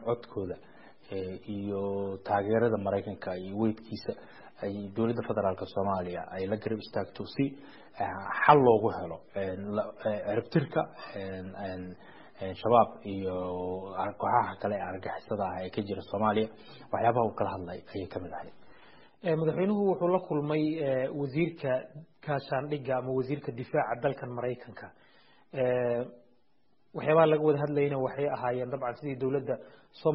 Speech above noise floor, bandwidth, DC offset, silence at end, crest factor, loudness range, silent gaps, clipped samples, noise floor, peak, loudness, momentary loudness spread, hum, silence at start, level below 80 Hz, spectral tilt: 43 dB; 5.6 kHz; 0.2%; 0 s; 24 dB; 5 LU; none; under 0.1%; -73 dBFS; -6 dBFS; -31 LUFS; 13 LU; none; 0 s; -66 dBFS; -6 dB/octave